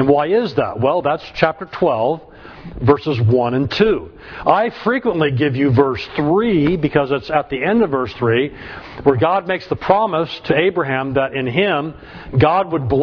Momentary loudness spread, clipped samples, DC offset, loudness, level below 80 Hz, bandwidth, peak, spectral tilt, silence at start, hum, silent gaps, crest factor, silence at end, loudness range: 7 LU; under 0.1%; under 0.1%; -17 LUFS; -42 dBFS; 5.4 kHz; 0 dBFS; -8.5 dB/octave; 0 s; none; none; 16 dB; 0 s; 1 LU